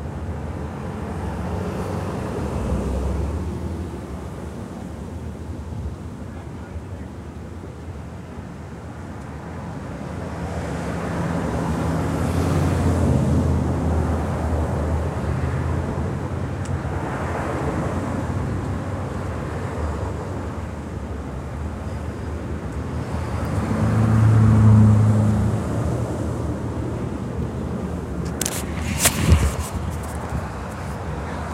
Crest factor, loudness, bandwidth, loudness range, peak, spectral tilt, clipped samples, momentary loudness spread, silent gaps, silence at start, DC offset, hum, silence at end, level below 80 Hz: 22 dB; -24 LUFS; 16 kHz; 15 LU; 0 dBFS; -6.5 dB/octave; under 0.1%; 15 LU; none; 0 s; under 0.1%; none; 0 s; -32 dBFS